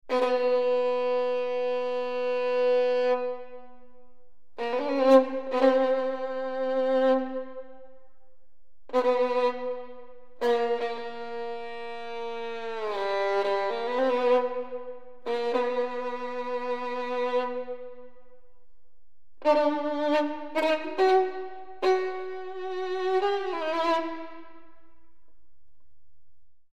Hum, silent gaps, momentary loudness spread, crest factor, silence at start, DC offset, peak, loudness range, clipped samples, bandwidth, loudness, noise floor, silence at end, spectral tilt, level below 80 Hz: none; none; 13 LU; 22 dB; 0 s; 1%; -6 dBFS; 6 LU; under 0.1%; 8.4 kHz; -27 LUFS; -68 dBFS; 0 s; -4 dB/octave; -68 dBFS